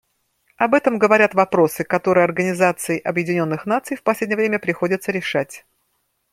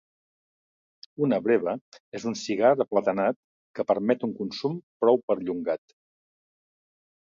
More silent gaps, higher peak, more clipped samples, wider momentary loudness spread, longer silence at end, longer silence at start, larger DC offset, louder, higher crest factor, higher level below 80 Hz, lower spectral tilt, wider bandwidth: second, none vs 1.81-1.92 s, 2.00-2.12 s, 3.36-3.74 s, 4.83-5.00 s, 5.23-5.28 s; first, -2 dBFS vs -8 dBFS; neither; second, 7 LU vs 12 LU; second, 0.75 s vs 1.45 s; second, 0.6 s vs 1.2 s; neither; first, -19 LUFS vs -26 LUFS; about the same, 18 dB vs 20 dB; first, -64 dBFS vs -72 dBFS; about the same, -5.5 dB/octave vs -6 dB/octave; first, 16.5 kHz vs 7.6 kHz